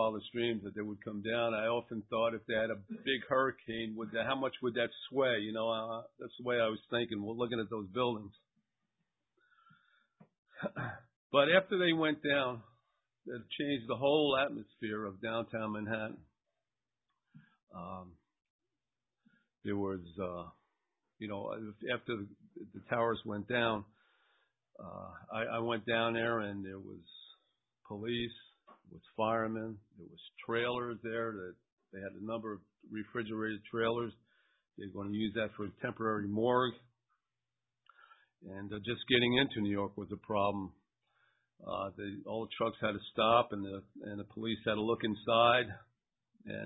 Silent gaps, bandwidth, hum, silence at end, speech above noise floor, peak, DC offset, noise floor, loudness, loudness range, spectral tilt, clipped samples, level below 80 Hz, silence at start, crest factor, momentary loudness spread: 10.38-10.43 s, 11.16-11.30 s, 17.63-17.67 s, 18.50-18.59 s, 31.72-31.77 s; 3.9 kHz; none; 0 s; over 54 dB; -12 dBFS; under 0.1%; under -90 dBFS; -35 LUFS; 10 LU; -2 dB/octave; under 0.1%; -68 dBFS; 0 s; 24 dB; 18 LU